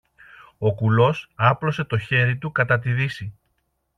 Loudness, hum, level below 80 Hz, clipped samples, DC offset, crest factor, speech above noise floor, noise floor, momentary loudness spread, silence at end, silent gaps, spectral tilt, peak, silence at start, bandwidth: -21 LUFS; none; -56 dBFS; under 0.1%; under 0.1%; 18 dB; 51 dB; -71 dBFS; 7 LU; 0.65 s; none; -7.5 dB/octave; -4 dBFS; 0.6 s; 6.6 kHz